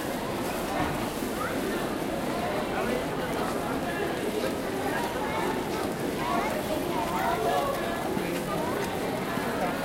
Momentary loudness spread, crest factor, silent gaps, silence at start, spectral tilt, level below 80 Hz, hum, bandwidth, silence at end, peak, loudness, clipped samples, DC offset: 3 LU; 14 dB; none; 0 s; -4.5 dB/octave; -48 dBFS; none; 17 kHz; 0 s; -14 dBFS; -29 LUFS; under 0.1%; under 0.1%